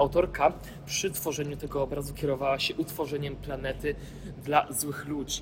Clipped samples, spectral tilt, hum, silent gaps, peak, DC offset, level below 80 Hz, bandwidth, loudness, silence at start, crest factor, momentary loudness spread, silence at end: under 0.1%; -4 dB/octave; none; none; -8 dBFS; under 0.1%; -46 dBFS; 17 kHz; -30 LUFS; 0 s; 22 dB; 9 LU; 0 s